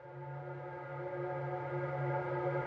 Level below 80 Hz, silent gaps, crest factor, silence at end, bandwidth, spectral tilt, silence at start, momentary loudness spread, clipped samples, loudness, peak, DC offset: -72 dBFS; none; 14 dB; 0 s; 5.2 kHz; -10 dB/octave; 0 s; 9 LU; under 0.1%; -40 LUFS; -24 dBFS; under 0.1%